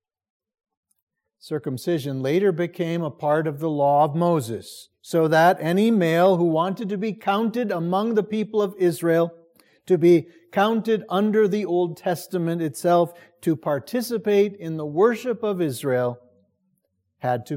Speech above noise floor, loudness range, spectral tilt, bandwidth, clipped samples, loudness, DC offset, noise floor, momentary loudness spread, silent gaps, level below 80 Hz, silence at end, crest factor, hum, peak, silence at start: 51 dB; 4 LU; -6.5 dB/octave; 16.5 kHz; under 0.1%; -22 LUFS; under 0.1%; -72 dBFS; 9 LU; none; -74 dBFS; 0 s; 16 dB; none; -6 dBFS; 1.45 s